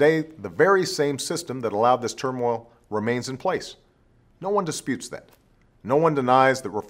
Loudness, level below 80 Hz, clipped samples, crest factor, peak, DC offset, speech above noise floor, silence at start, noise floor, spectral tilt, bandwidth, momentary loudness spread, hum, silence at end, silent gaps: -23 LUFS; -62 dBFS; under 0.1%; 20 dB; -4 dBFS; under 0.1%; 37 dB; 0 s; -59 dBFS; -4.5 dB/octave; 16 kHz; 13 LU; none; 0 s; none